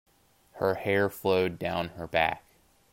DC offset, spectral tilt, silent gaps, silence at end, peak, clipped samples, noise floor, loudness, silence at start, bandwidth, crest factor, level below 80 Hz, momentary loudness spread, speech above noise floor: under 0.1%; -6 dB/octave; none; 0.55 s; -8 dBFS; under 0.1%; -59 dBFS; -28 LUFS; 0.55 s; 16 kHz; 20 dB; -60 dBFS; 5 LU; 31 dB